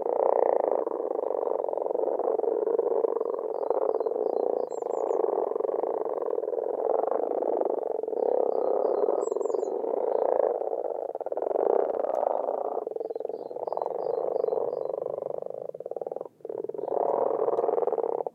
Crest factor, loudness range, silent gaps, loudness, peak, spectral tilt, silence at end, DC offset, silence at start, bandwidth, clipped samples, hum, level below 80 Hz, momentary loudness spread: 20 dB; 4 LU; none; -29 LUFS; -8 dBFS; -7 dB/octave; 0.05 s; under 0.1%; 0 s; 8.2 kHz; under 0.1%; none; -86 dBFS; 8 LU